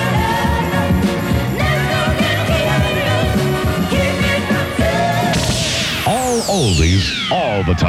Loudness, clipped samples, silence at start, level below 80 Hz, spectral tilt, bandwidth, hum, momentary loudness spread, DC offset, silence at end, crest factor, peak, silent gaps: -16 LUFS; under 0.1%; 0 s; -28 dBFS; -5 dB/octave; 16.5 kHz; none; 2 LU; under 0.1%; 0 s; 14 dB; -2 dBFS; none